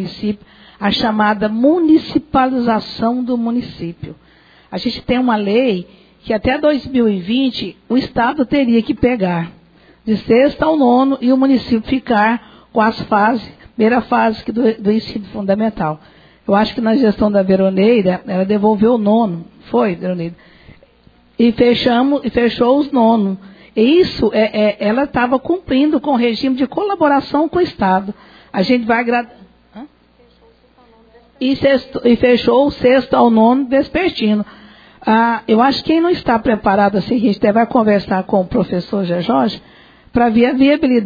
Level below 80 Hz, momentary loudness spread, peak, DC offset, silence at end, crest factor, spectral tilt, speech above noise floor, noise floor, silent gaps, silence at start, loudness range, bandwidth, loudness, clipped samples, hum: -44 dBFS; 10 LU; 0 dBFS; under 0.1%; 0 s; 14 dB; -8 dB/octave; 36 dB; -50 dBFS; none; 0 s; 4 LU; 5 kHz; -15 LUFS; under 0.1%; none